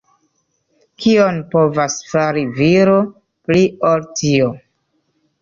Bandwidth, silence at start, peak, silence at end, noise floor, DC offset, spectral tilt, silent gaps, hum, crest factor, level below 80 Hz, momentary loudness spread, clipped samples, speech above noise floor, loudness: 7.6 kHz; 1 s; -2 dBFS; 0.85 s; -66 dBFS; under 0.1%; -5.5 dB/octave; none; none; 14 dB; -52 dBFS; 7 LU; under 0.1%; 51 dB; -15 LUFS